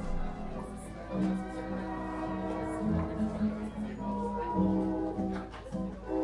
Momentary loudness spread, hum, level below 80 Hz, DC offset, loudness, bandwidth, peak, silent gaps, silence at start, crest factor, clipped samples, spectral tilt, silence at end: 9 LU; none; -44 dBFS; under 0.1%; -35 LUFS; 11.5 kHz; -18 dBFS; none; 0 s; 16 dB; under 0.1%; -8 dB/octave; 0 s